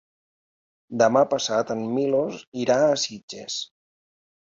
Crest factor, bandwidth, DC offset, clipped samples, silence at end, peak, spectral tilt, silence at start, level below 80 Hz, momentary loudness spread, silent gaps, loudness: 18 dB; 7.8 kHz; under 0.1%; under 0.1%; 0.85 s; -6 dBFS; -4 dB/octave; 0.9 s; -68 dBFS; 12 LU; 2.47-2.52 s, 3.23-3.28 s; -23 LUFS